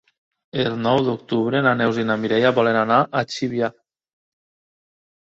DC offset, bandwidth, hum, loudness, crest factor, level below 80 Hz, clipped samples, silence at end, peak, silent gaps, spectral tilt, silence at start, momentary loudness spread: under 0.1%; 7.8 kHz; none; -20 LUFS; 20 dB; -62 dBFS; under 0.1%; 1.7 s; -2 dBFS; none; -6 dB/octave; 0.55 s; 7 LU